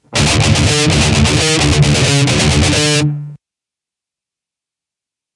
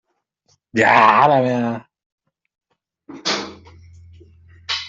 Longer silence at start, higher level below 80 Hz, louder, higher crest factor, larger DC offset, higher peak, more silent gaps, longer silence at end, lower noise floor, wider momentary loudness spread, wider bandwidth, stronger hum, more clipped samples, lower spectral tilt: second, 0.1 s vs 0.75 s; first, -28 dBFS vs -60 dBFS; first, -11 LUFS vs -16 LUFS; about the same, 14 dB vs 18 dB; neither; about the same, 0 dBFS vs -2 dBFS; second, none vs 2.06-2.18 s; first, 2 s vs 0 s; first, -86 dBFS vs -65 dBFS; second, 2 LU vs 20 LU; first, 11.5 kHz vs 8 kHz; neither; neither; about the same, -4 dB/octave vs -4.5 dB/octave